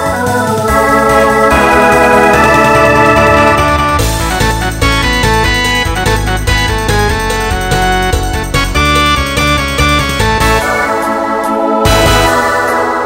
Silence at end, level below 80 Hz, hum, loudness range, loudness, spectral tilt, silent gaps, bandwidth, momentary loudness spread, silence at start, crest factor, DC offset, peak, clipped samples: 0 s; -20 dBFS; none; 4 LU; -9 LUFS; -4 dB/octave; none; 16.5 kHz; 6 LU; 0 s; 10 dB; under 0.1%; 0 dBFS; 0.3%